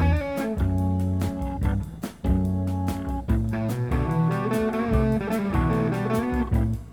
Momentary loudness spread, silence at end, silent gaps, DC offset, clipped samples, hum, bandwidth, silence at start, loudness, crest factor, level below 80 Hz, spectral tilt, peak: 5 LU; 0 s; none; 0.1%; under 0.1%; none; 19 kHz; 0 s; -25 LUFS; 16 dB; -32 dBFS; -8 dB/octave; -8 dBFS